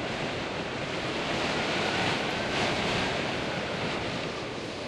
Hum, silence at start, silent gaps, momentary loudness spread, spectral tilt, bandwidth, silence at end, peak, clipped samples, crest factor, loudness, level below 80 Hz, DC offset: none; 0 s; none; 6 LU; -4 dB/octave; 12.5 kHz; 0 s; -16 dBFS; under 0.1%; 16 dB; -29 LUFS; -52 dBFS; under 0.1%